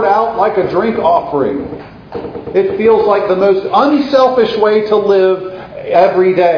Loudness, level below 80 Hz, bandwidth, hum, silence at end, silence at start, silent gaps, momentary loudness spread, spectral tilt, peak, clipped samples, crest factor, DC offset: -12 LUFS; -46 dBFS; 5.4 kHz; none; 0 s; 0 s; none; 15 LU; -7 dB/octave; 0 dBFS; under 0.1%; 12 dB; under 0.1%